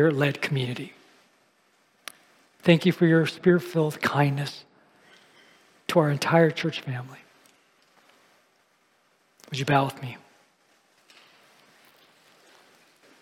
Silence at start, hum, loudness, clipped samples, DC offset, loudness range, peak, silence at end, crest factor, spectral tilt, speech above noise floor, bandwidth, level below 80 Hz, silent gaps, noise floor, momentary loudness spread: 0 s; none; -24 LUFS; under 0.1%; under 0.1%; 8 LU; -6 dBFS; 3.05 s; 22 dB; -6.5 dB/octave; 43 dB; 15.5 kHz; -70 dBFS; none; -66 dBFS; 23 LU